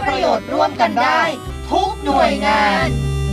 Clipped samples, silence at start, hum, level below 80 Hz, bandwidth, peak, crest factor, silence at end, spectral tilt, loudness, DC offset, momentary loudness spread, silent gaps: under 0.1%; 0 s; none; -30 dBFS; 15 kHz; -2 dBFS; 14 dB; 0 s; -5.5 dB/octave; -16 LUFS; under 0.1%; 6 LU; none